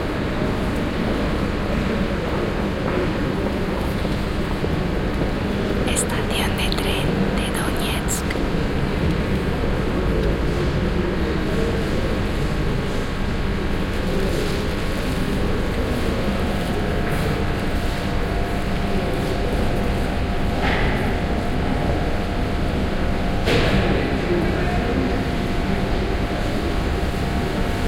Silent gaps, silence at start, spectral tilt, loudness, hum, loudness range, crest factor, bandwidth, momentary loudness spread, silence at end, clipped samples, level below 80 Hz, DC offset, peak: none; 0 s; -5.5 dB/octave; -22 LUFS; none; 2 LU; 14 dB; 16.5 kHz; 3 LU; 0 s; under 0.1%; -26 dBFS; under 0.1%; -6 dBFS